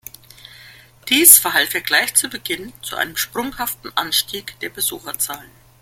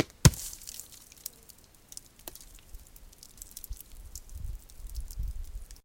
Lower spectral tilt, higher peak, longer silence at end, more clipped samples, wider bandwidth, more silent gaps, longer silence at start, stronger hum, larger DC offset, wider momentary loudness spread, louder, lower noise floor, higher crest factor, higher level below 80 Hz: second, 0.5 dB/octave vs -4.5 dB/octave; about the same, 0 dBFS vs -2 dBFS; first, 0.4 s vs 0.05 s; first, 0.1% vs under 0.1%; about the same, 17 kHz vs 17 kHz; neither; first, 0.6 s vs 0 s; neither; neither; about the same, 19 LU vs 18 LU; first, -16 LUFS vs -34 LUFS; second, -45 dBFS vs -56 dBFS; second, 20 dB vs 32 dB; second, -54 dBFS vs -40 dBFS